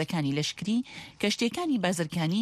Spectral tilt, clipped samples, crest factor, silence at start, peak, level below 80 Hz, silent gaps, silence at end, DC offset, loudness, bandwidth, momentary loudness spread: -5 dB/octave; under 0.1%; 16 dB; 0 s; -12 dBFS; -66 dBFS; none; 0 s; under 0.1%; -29 LUFS; 15 kHz; 4 LU